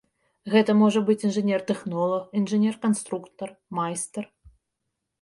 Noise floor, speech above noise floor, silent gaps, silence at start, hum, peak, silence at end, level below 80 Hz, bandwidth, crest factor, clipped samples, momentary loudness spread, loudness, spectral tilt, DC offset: -81 dBFS; 57 dB; none; 0.45 s; none; -8 dBFS; 0.95 s; -66 dBFS; 11.5 kHz; 16 dB; under 0.1%; 17 LU; -24 LUFS; -5.5 dB/octave; under 0.1%